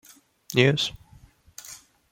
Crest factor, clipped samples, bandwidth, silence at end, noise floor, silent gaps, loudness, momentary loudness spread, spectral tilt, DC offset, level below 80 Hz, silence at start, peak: 24 dB; under 0.1%; 17 kHz; 0.35 s; -54 dBFS; none; -23 LUFS; 24 LU; -5 dB/octave; under 0.1%; -58 dBFS; 0.5 s; -4 dBFS